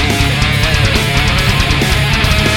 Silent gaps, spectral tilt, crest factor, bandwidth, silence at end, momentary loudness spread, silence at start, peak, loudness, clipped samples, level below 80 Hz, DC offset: none; -4 dB/octave; 12 dB; 17.5 kHz; 0 s; 1 LU; 0 s; 0 dBFS; -12 LUFS; under 0.1%; -18 dBFS; under 0.1%